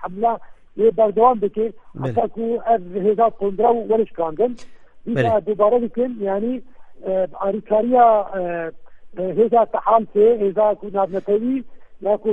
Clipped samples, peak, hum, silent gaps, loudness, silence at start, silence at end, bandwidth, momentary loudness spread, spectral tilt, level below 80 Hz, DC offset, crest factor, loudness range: under 0.1%; -2 dBFS; none; none; -19 LUFS; 0 s; 0 s; 4.9 kHz; 12 LU; -9 dB/octave; -52 dBFS; under 0.1%; 16 dB; 3 LU